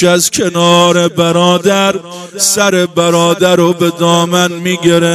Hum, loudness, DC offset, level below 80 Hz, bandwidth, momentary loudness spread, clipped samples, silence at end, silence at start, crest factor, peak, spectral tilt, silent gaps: none; -10 LUFS; under 0.1%; -52 dBFS; 16 kHz; 5 LU; 0.3%; 0 s; 0 s; 10 dB; 0 dBFS; -4 dB/octave; none